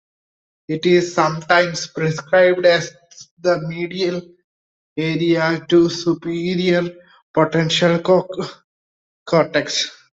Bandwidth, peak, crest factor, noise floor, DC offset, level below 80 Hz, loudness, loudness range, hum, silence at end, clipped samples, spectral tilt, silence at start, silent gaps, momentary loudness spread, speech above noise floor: 8 kHz; -2 dBFS; 18 dB; under -90 dBFS; under 0.1%; -60 dBFS; -18 LUFS; 3 LU; none; 0.25 s; under 0.1%; -5 dB/octave; 0.7 s; 3.31-3.37 s, 4.44-4.96 s, 7.22-7.34 s, 8.64-9.26 s; 10 LU; over 73 dB